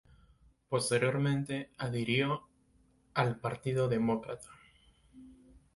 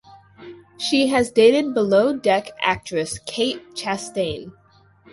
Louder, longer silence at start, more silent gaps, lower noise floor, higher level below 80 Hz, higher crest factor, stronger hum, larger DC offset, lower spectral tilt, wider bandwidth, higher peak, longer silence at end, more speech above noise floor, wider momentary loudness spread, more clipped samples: second, -33 LUFS vs -20 LUFS; first, 0.7 s vs 0.4 s; neither; first, -68 dBFS vs -52 dBFS; second, -64 dBFS vs -54 dBFS; about the same, 20 dB vs 18 dB; neither; neither; first, -5.5 dB/octave vs -4 dB/octave; about the same, 11.5 kHz vs 11.5 kHz; second, -14 dBFS vs -4 dBFS; second, 0.15 s vs 0.6 s; first, 36 dB vs 32 dB; second, 9 LU vs 12 LU; neither